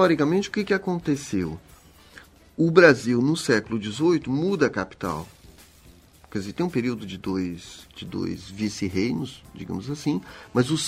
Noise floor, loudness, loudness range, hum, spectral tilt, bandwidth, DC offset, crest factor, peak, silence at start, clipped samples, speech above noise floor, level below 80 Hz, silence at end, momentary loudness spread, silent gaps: -52 dBFS; -24 LUFS; 9 LU; none; -5.5 dB/octave; 15.5 kHz; under 0.1%; 24 dB; -2 dBFS; 0 s; under 0.1%; 28 dB; -54 dBFS; 0 s; 15 LU; none